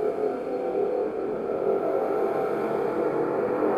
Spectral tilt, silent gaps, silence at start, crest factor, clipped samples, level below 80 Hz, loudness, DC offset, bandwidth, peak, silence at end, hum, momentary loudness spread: -8 dB/octave; none; 0 s; 14 dB; under 0.1%; -62 dBFS; -27 LUFS; under 0.1%; 13.5 kHz; -12 dBFS; 0 s; none; 3 LU